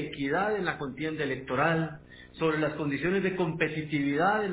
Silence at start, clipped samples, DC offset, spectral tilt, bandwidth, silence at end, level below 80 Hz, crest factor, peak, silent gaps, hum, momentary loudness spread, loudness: 0 s; under 0.1%; under 0.1%; -5 dB/octave; 4 kHz; 0 s; -58 dBFS; 18 dB; -12 dBFS; none; none; 7 LU; -29 LUFS